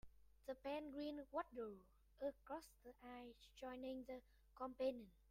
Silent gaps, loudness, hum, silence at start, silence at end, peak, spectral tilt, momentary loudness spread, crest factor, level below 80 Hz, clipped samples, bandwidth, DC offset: none; -52 LUFS; none; 0.05 s; 0.05 s; -34 dBFS; -5 dB/octave; 13 LU; 20 dB; -74 dBFS; under 0.1%; 16 kHz; under 0.1%